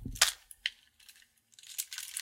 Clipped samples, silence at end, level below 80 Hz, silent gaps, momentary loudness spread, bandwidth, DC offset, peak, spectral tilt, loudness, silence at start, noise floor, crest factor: under 0.1%; 0 s; -56 dBFS; none; 14 LU; 16.5 kHz; under 0.1%; -6 dBFS; 0.5 dB/octave; -33 LUFS; 0 s; -62 dBFS; 32 dB